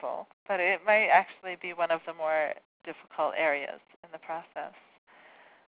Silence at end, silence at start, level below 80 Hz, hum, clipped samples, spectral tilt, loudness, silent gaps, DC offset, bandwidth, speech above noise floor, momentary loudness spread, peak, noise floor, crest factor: 1 s; 0 s; -80 dBFS; none; under 0.1%; -0.5 dB/octave; -28 LUFS; 0.33-0.46 s, 2.65-2.80 s, 3.96-4.03 s; under 0.1%; 4 kHz; 27 dB; 21 LU; -8 dBFS; -57 dBFS; 22 dB